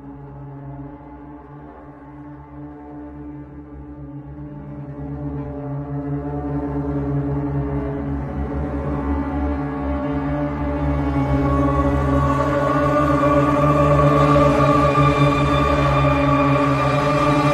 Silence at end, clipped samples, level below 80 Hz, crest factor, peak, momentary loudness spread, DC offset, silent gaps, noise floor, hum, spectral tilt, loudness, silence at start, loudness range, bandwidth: 0 s; under 0.1%; -30 dBFS; 16 dB; -2 dBFS; 22 LU; under 0.1%; none; -39 dBFS; none; -8 dB/octave; -19 LUFS; 0 s; 21 LU; 10 kHz